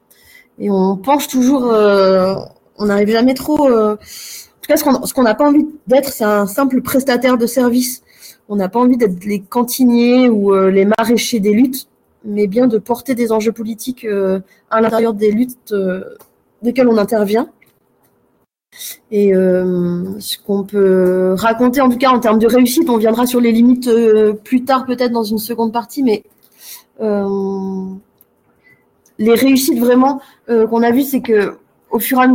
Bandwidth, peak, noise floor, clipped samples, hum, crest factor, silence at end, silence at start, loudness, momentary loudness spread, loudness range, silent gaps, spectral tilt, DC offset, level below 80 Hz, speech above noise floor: 17 kHz; -2 dBFS; -61 dBFS; under 0.1%; none; 12 dB; 0 s; 0.6 s; -14 LUFS; 11 LU; 6 LU; none; -5.5 dB/octave; under 0.1%; -52 dBFS; 48 dB